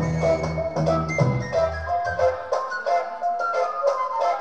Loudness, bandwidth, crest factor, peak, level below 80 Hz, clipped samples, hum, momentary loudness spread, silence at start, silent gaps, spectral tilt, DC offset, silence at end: -24 LUFS; 8.8 kHz; 16 dB; -8 dBFS; -42 dBFS; under 0.1%; none; 4 LU; 0 s; none; -6.5 dB/octave; 0.3%; 0 s